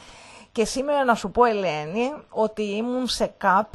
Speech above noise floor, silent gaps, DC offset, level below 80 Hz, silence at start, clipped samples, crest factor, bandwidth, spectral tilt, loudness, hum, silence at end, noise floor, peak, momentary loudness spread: 24 dB; none; under 0.1%; -50 dBFS; 0 s; under 0.1%; 18 dB; 12.5 kHz; -4 dB/octave; -24 LUFS; none; 0.05 s; -46 dBFS; -6 dBFS; 7 LU